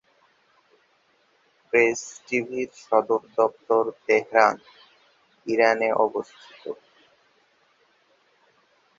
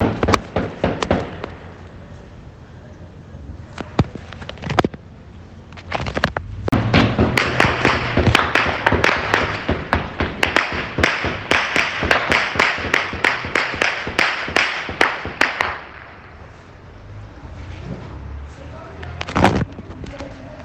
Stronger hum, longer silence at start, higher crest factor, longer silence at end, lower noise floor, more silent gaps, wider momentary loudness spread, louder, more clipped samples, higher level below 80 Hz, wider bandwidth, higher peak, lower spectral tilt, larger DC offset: neither; first, 1.75 s vs 0 s; about the same, 24 dB vs 20 dB; first, 2.25 s vs 0 s; first, -64 dBFS vs -40 dBFS; neither; second, 18 LU vs 23 LU; second, -23 LUFS vs -18 LUFS; neither; second, -74 dBFS vs -36 dBFS; second, 7.8 kHz vs 19 kHz; about the same, -2 dBFS vs 0 dBFS; about the same, -4 dB/octave vs -5 dB/octave; neither